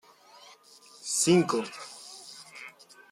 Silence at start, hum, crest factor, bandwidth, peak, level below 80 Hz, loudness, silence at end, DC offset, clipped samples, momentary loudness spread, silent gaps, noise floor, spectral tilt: 1.05 s; none; 20 dB; 15 kHz; -10 dBFS; -76 dBFS; -26 LUFS; 0.4 s; under 0.1%; under 0.1%; 22 LU; none; -55 dBFS; -4 dB/octave